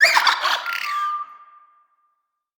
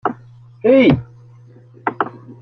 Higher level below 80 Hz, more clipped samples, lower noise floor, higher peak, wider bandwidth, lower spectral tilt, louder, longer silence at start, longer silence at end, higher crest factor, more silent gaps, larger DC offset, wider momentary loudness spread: second, -86 dBFS vs -48 dBFS; neither; first, -73 dBFS vs -44 dBFS; about the same, -2 dBFS vs -2 dBFS; first, over 20 kHz vs 6 kHz; second, 2.5 dB/octave vs -9 dB/octave; second, -20 LUFS vs -17 LUFS; about the same, 0 s vs 0.05 s; first, 1.15 s vs 0.1 s; first, 22 dB vs 16 dB; neither; neither; about the same, 14 LU vs 14 LU